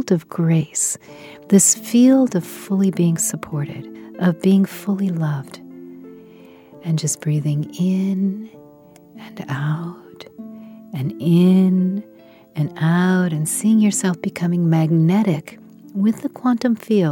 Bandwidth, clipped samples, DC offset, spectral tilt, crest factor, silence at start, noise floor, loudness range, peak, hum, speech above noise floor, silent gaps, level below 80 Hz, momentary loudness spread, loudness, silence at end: 17.5 kHz; under 0.1%; under 0.1%; -6 dB/octave; 18 dB; 0 s; -46 dBFS; 7 LU; -2 dBFS; none; 28 dB; none; -66 dBFS; 23 LU; -18 LUFS; 0 s